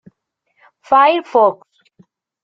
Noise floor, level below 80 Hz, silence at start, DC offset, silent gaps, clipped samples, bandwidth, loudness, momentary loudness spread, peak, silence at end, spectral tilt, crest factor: -68 dBFS; -68 dBFS; 0.9 s; under 0.1%; none; under 0.1%; 7.2 kHz; -14 LUFS; 7 LU; -2 dBFS; 0.9 s; -5 dB/octave; 16 dB